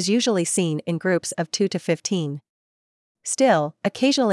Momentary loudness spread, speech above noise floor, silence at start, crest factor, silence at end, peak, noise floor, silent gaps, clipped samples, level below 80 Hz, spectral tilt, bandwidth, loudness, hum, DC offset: 9 LU; over 68 dB; 0 s; 16 dB; 0 s; -6 dBFS; under -90 dBFS; 2.49-3.15 s; under 0.1%; -74 dBFS; -4 dB/octave; 12 kHz; -22 LUFS; none; under 0.1%